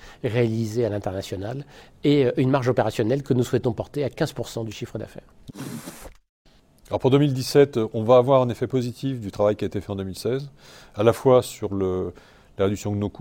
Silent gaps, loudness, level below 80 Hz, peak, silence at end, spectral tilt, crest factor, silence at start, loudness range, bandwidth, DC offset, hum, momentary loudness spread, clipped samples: 6.29-6.45 s; -23 LUFS; -52 dBFS; -4 dBFS; 0.1 s; -7 dB/octave; 20 dB; 0.05 s; 7 LU; 17 kHz; under 0.1%; none; 15 LU; under 0.1%